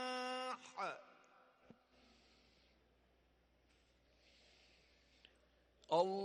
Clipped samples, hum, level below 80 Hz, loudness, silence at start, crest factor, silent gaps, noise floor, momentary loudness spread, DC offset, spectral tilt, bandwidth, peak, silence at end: under 0.1%; none; -80 dBFS; -43 LUFS; 0 s; 24 dB; none; -75 dBFS; 16 LU; under 0.1%; -4 dB/octave; 11.5 kHz; -24 dBFS; 0 s